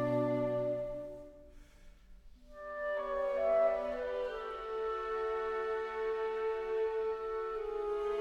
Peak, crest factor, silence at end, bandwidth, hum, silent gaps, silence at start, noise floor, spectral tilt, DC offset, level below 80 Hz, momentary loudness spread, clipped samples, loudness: -20 dBFS; 16 dB; 0 s; 8.2 kHz; none; none; 0 s; -56 dBFS; -7 dB/octave; under 0.1%; -58 dBFS; 9 LU; under 0.1%; -36 LUFS